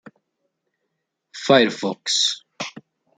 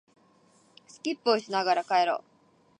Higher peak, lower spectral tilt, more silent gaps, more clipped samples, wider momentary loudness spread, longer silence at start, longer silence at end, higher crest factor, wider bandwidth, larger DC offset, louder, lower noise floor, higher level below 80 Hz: first, -2 dBFS vs -10 dBFS; about the same, -2.5 dB/octave vs -3.5 dB/octave; neither; neither; first, 17 LU vs 10 LU; first, 1.35 s vs 1.05 s; second, 0.4 s vs 0.6 s; about the same, 22 dB vs 20 dB; about the same, 9.6 kHz vs 10 kHz; neither; first, -19 LUFS vs -27 LUFS; first, -77 dBFS vs -62 dBFS; first, -68 dBFS vs -86 dBFS